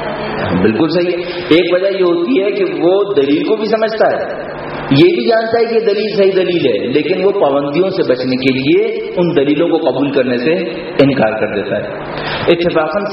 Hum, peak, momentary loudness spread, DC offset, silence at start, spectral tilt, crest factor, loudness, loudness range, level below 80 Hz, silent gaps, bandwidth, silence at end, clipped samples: none; 0 dBFS; 7 LU; under 0.1%; 0 s; -4.5 dB/octave; 12 dB; -13 LUFS; 1 LU; -46 dBFS; none; 5.8 kHz; 0 s; under 0.1%